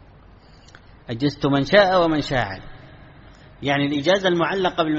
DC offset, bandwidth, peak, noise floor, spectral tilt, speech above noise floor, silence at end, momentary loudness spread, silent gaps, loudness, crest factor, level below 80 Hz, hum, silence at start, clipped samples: under 0.1%; 8 kHz; 0 dBFS; -48 dBFS; -3.5 dB/octave; 28 dB; 0 s; 14 LU; none; -20 LUFS; 22 dB; -46 dBFS; none; 1.1 s; under 0.1%